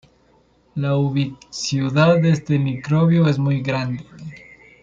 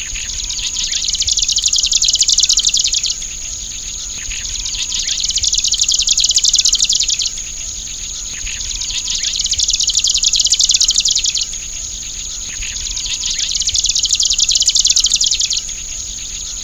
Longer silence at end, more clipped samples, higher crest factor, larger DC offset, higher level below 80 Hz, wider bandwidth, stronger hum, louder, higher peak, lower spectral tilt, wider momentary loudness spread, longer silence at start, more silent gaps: first, 0.45 s vs 0 s; neither; about the same, 16 dB vs 16 dB; neither; second, -54 dBFS vs -34 dBFS; second, 7.6 kHz vs over 20 kHz; neither; second, -19 LUFS vs -13 LUFS; second, -4 dBFS vs 0 dBFS; first, -7 dB/octave vs 2.5 dB/octave; first, 16 LU vs 12 LU; first, 0.75 s vs 0 s; neither